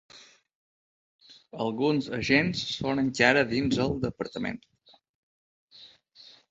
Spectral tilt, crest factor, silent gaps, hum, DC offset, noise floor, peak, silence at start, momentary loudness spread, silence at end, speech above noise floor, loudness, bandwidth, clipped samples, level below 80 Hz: -5 dB/octave; 24 dB; 0.55-1.19 s, 5.09-5.68 s; none; under 0.1%; -55 dBFS; -4 dBFS; 0.15 s; 12 LU; 0.65 s; 28 dB; -26 LUFS; 8 kHz; under 0.1%; -56 dBFS